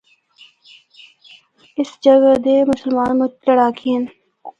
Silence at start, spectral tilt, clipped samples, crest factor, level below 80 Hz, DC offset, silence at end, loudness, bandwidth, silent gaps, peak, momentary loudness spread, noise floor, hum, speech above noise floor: 1.8 s; -6 dB/octave; under 0.1%; 16 dB; -58 dBFS; under 0.1%; 0.1 s; -15 LUFS; 7.8 kHz; none; 0 dBFS; 13 LU; -49 dBFS; none; 35 dB